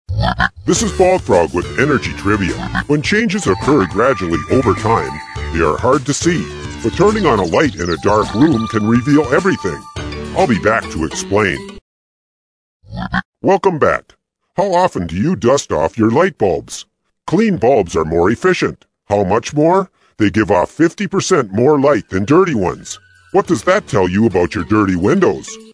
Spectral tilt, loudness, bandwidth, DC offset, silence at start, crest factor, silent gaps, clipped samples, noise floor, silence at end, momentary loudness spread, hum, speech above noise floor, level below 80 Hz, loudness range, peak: -5.5 dB/octave; -15 LUFS; 11 kHz; under 0.1%; 0.1 s; 14 dB; 11.81-12.80 s, 13.25-13.33 s; under 0.1%; under -90 dBFS; 0.1 s; 9 LU; none; over 76 dB; -36 dBFS; 4 LU; 0 dBFS